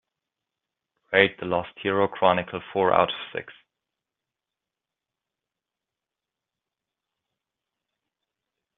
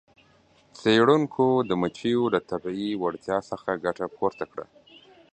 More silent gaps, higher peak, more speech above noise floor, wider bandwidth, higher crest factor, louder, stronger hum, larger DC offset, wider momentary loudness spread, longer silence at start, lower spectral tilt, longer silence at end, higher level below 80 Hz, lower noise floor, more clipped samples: neither; about the same, -2 dBFS vs -4 dBFS; first, 64 dB vs 35 dB; second, 4.2 kHz vs 9 kHz; first, 28 dB vs 22 dB; about the same, -23 LUFS vs -25 LUFS; neither; neither; about the same, 11 LU vs 11 LU; first, 1.1 s vs 0.75 s; second, -2.5 dB/octave vs -6.5 dB/octave; first, 5.25 s vs 0.7 s; second, -68 dBFS vs -62 dBFS; first, -88 dBFS vs -60 dBFS; neither